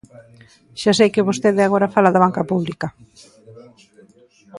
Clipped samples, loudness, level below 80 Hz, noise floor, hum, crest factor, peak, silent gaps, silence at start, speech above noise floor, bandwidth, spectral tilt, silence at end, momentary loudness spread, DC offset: under 0.1%; -17 LUFS; -58 dBFS; -51 dBFS; none; 20 dB; 0 dBFS; none; 0.75 s; 33 dB; 11.5 kHz; -5.5 dB/octave; 0 s; 13 LU; under 0.1%